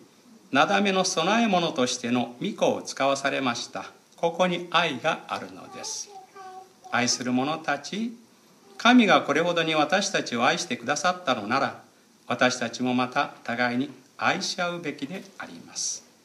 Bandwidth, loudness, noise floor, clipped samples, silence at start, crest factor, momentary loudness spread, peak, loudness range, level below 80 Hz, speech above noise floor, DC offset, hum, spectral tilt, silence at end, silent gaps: 13 kHz; -25 LUFS; -55 dBFS; under 0.1%; 0.5 s; 20 dB; 14 LU; -6 dBFS; 6 LU; -76 dBFS; 30 dB; under 0.1%; none; -3.5 dB/octave; 0.25 s; none